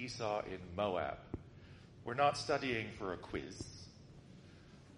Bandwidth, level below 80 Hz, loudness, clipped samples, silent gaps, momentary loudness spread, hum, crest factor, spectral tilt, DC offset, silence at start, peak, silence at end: 11.5 kHz; -62 dBFS; -39 LUFS; under 0.1%; none; 24 LU; none; 22 dB; -5 dB/octave; under 0.1%; 0 s; -20 dBFS; 0 s